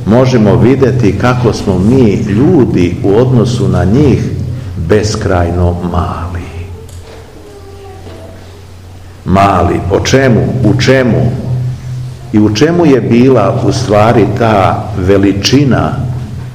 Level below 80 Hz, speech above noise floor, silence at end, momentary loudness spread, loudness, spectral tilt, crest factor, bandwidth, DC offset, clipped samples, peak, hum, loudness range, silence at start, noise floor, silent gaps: -30 dBFS; 22 dB; 0 s; 15 LU; -9 LUFS; -7 dB/octave; 10 dB; 12 kHz; 0.9%; 2%; 0 dBFS; none; 8 LU; 0 s; -30 dBFS; none